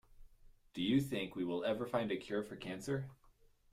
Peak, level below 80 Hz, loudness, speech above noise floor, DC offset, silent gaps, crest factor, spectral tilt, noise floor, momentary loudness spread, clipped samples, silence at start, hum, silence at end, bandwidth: -20 dBFS; -66 dBFS; -39 LUFS; 30 dB; under 0.1%; none; 20 dB; -6 dB/octave; -68 dBFS; 10 LU; under 0.1%; 0.15 s; none; 0.6 s; 15.5 kHz